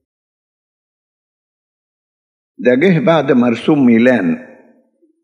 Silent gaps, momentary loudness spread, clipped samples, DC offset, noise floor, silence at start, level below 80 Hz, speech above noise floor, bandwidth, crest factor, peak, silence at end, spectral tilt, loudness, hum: none; 8 LU; under 0.1%; under 0.1%; -56 dBFS; 2.6 s; -68 dBFS; 44 dB; 7 kHz; 16 dB; 0 dBFS; 0.8 s; -8 dB/octave; -12 LUFS; none